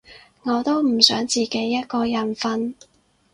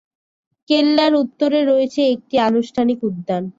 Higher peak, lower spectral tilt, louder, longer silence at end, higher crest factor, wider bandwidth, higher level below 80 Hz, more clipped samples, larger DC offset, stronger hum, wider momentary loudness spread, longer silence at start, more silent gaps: about the same, 0 dBFS vs -2 dBFS; second, -3 dB/octave vs -6 dB/octave; second, -20 LUFS vs -17 LUFS; first, 0.6 s vs 0.1 s; first, 22 dB vs 14 dB; first, 15.5 kHz vs 7.8 kHz; about the same, -60 dBFS vs -62 dBFS; neither; neither; neither; first, 11 LU vs 6 LU; second, 0.1 s vs 0.7 s; neither